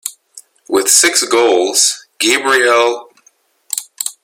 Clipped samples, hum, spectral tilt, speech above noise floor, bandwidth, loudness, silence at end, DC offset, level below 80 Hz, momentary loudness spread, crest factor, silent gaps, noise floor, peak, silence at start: under 0.1%; none; 0.5 dB/octave; 42 dB; over 20 kHz; -12 LUFS; 0.1 s; under 0.1%; -62 dBFS; 14 LU; 14 dB; none; -54 dBFS; 0 dBFS; 0.05 s